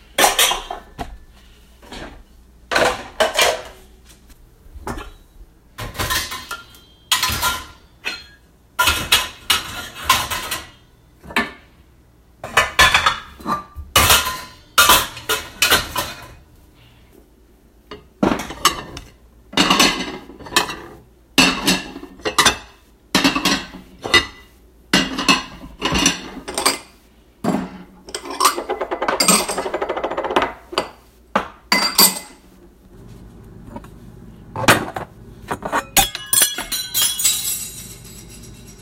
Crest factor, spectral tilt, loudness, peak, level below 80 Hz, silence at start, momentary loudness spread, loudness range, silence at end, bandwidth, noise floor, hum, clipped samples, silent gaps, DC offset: 22 dB; -1.5 dB/octave; -17 LUFS; 0 dBFS; -40 dBFS; 0.2 s; 21 LU; 7 LU; 0 s; 16.5 kHz; -51 dBFS; none; under 0.1%; none; under 0.1%